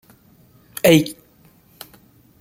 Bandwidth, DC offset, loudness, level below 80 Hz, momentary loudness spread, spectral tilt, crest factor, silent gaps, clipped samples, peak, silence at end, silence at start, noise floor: 16.5 kHz; under 0.1%; -16 LUFS; -56 dBFS; 27 LU; -5 dB/octave; 20 dB; none; under 0.1%; -2 dBFS; 1.3 s; 0.85 s; -53 dBFS